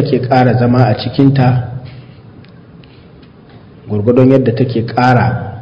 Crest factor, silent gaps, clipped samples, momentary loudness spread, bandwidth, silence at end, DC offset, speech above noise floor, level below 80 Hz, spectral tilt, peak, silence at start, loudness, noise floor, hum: 12 dB; none; 0.7%; 10 LU; 6.2 kHz; 0 s; under 0.1%; 28 dB; -40 dBFS; -9.5 dB/octave; 0 dBFS; 0 s; -11 LUFS; -38 dBFS; none